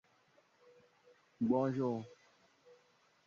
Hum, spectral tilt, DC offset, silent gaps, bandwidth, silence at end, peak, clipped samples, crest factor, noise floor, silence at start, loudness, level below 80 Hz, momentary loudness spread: none; -8.5 dB/octave; under 0.1%; none; 7 kHz; 1.15 s; -20 dBFS; under 0.1%; 20 dB; -71 dBFS; 1.4 s; -36 LUFS; -80 dBFS; 12 LU